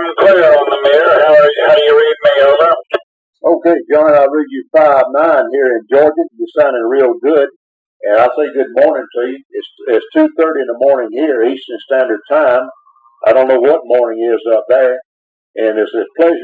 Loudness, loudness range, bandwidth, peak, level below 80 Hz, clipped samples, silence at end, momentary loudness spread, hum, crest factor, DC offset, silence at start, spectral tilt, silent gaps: -11 LUFS; 4 LU; 4.8 kHz; 0 dBFS; -62 dBFS; under 0.1%; 0 s; 10 LU; none; 10 dB; under 0.1%; 0 s; -6 dB/octave; 3.03-3.33 s, 7.56-8.00 s, 9.45-9.50 s, 15.05-15.54 s